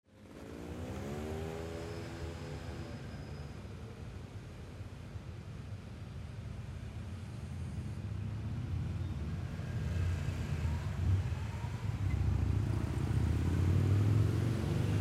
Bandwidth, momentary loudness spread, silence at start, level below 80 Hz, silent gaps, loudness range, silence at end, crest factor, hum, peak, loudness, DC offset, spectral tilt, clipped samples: 12.5 kHz; 15 LU; 0.1 s; -44 dBFS; none; 13 LU; 0 s; 16 dB; none; -20 dBFS; -38 LUFS; under 0.1%; -7.5 dB/octave; under 0.1%